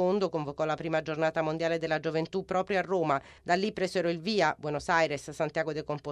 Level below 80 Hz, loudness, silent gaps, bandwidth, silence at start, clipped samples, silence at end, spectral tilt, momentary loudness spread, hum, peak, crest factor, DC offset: -62 dBFS; -30 LUFS; none; 12.5 kHz; 0 s; under 0.1%; 0 s; -5.5 dB/octave; 5 LU; none; -12 dBFS; 18 dB; under 0.1%